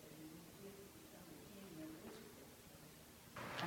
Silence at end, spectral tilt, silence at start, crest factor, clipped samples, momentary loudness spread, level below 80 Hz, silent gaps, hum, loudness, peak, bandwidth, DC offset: 0 s; -4 dB/octave; 0 s; 28 dB; under 0.1%; 6 LU; -76 dBFS; none; none; -57 LUFS; -26 dBFS; 17.5 kHz; under 0.1%